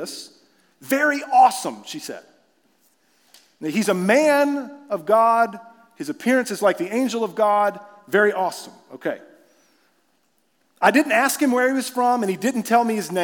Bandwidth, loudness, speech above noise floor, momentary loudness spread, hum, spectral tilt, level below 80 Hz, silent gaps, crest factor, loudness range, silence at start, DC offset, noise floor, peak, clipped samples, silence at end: 18 kHz; -20 LUFS; 47 dB; 17 LU; none; -4 dB/octave; -86 dBFS; none; 20 dB; 3 LU; 0 s; under 0.1%; -67 dBFS; -2 dBFS; under 0.1%; 0 s